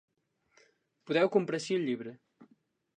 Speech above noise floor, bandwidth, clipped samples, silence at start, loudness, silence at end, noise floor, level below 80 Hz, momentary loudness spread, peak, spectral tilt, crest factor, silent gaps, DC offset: 40 dB; 10 kHz; under 0.1%; 1.05 s; -31 LUFS; 0.5 s; -70 dBFS; -84 dBFS; 11 LU; -14 dBFS; -5.5 dB/octave; 20 dB; none; under 0.1%